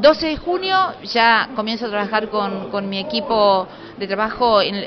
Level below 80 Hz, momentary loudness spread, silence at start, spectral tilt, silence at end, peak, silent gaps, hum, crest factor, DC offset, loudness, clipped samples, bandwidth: -48 dBFS; 9 LU; 0 s; -1.5 dB/octave; 0 s; -2 dBFS; none; none; 16 dB; under 0.1%; -18 LUFS; under 0.1%; 6.4 kHz